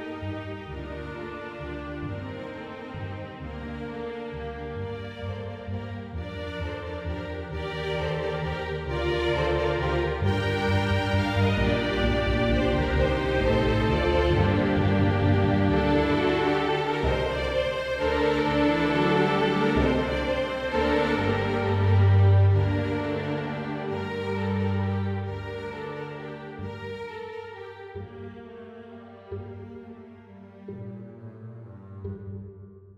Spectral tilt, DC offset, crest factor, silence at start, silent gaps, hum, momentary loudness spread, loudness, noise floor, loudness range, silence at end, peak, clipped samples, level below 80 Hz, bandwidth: -7.5 dB/octave; under 0.1%; 16 dB; 0 s; none; none; 18 LU; -26 LUFS; -47 dBFS; 17 LU; 0.05 s; -10 dBFS; under 0.1%; -38 dBFS; 8.8 kHz